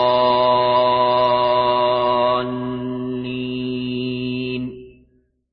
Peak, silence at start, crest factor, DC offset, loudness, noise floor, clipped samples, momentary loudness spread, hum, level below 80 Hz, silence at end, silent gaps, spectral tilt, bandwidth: -6 dBFS; 0 s; 14 dB; under 0.1%; -19 LUFS; -59 dBFS; under 0.1%; 10 LU; none; -52 dBFS; 0.6 s; none; -9.5 dB/octave; 5.4 kHz